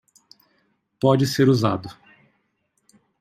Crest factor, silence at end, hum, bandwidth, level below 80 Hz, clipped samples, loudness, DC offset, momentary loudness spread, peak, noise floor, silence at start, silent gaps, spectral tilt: 20 dB; 1.3 s; none; 15.5 kHz; -62 dBFS; under 0.1%; -20 LUFS; under 0.1%; 12 LU; -4 dBFS; -71 dBFS; 1.05 s; none; -6.5 dB/octave